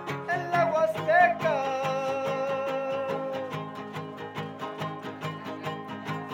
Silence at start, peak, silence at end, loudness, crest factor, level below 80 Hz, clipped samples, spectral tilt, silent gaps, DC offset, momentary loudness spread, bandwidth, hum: 0 s; -8 dBFS; 0 s; -29 LUFS; 20 dB; -74 dBFS; under 0.1%; -5.5 dB/octave; none; under 0.1%; 14 LU; 17 kHz; none